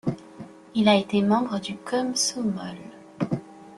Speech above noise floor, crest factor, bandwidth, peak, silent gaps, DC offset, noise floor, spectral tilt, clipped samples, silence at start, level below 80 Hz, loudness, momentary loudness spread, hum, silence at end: 20 dB; 20 dB; 12.5 kHz; -6 dBFS; none; under 0.1%; -44 dBFS; -4.5 dB/octave; under 0.1%; 0.05 s; -62 dBFS; -25 LUFS; 21 LU; none; 0 s